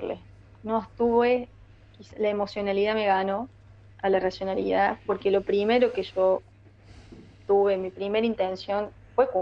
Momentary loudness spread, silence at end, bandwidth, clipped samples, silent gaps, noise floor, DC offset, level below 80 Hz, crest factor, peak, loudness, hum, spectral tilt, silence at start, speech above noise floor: 8 LU; 0 s; 7.4 kHz; under 0.1%; none; -52 dBFS; under 0.1%; -56 dBFS; 18 dB; -8 dBFS; -26 LUFS; none; -7 dB/octave; 0 s; 27 dB